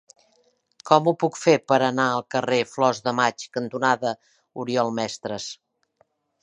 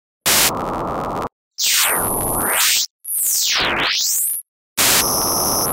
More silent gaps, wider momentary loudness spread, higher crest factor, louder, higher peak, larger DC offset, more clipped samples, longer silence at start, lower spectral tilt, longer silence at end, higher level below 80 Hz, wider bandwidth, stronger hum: second, none vs 1.32-1.51 s, 2.90-2.99 s, 4.48-4.76 s; first, 15 LU vs 10 LU; about the same, 22 dB vs 18 dB; second, -23 LUFS vs -16 LUFS; about the same, -2 dBFS vs 0 dBFS; neither; neither; first, 0.85 s vs 0.25 s; first, -4.5 dB/octave vs -0.5 dB/octave; first, 0.9 s vs 0 s; second, -70 dBFS vs -42 dBFS; second, 10.5 kHz vs 16.5 kHz; neither